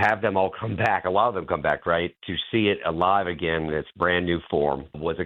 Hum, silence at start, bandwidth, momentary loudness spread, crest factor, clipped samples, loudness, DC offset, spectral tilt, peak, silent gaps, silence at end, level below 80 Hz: none; 0 s; 8.2 kHz; 5 LU; 16 dB; under 0.1%; -24 LUFS; under 0.1%; -7.5 dB/octave; -8 dBFS; none; 0 s; -50 dBFS